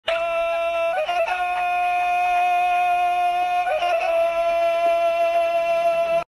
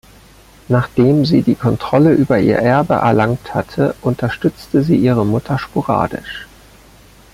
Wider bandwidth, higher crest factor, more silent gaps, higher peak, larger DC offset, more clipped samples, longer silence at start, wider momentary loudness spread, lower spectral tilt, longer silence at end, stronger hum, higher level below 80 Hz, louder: second, 13 kHz vs 15.5 kHz; about the same, 12 dB vs 14 dB; neither; second, -10 dBFS vs -2 dBFS; neither; neither; second, 0.05 s vs 0.7 s; second, 3 LU vs 8 LU; second, -2 dB/octave vs -8 dB/octave; second, 0.05 s vs 0.9 s; neither; second, -56 dBFS vs -42 dBFS; second, -21 LUFS vs -15 LUFS